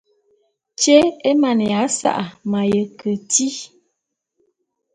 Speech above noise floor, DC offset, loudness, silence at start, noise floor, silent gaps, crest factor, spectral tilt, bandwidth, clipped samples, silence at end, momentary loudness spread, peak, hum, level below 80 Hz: 59 dB; under 0.1%; -18 LUFS; 0.8 s; -77 dBFS; none; 18 dB; -3.5 dB/octave; 10 kHz; under 0.1%; 1.3 s; 12 LU; 0 dBFS; none; -58 dBFS